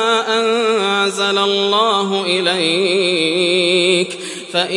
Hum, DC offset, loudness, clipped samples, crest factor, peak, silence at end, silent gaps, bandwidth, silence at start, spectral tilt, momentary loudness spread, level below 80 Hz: none; under 0.1%; -15 LUFS; under 0.1%; 14 dB; -2 dBFS; 0 s; none; 11.5 kHz; 0 s; -3 dB/octave; 4 LU; -72 dBFS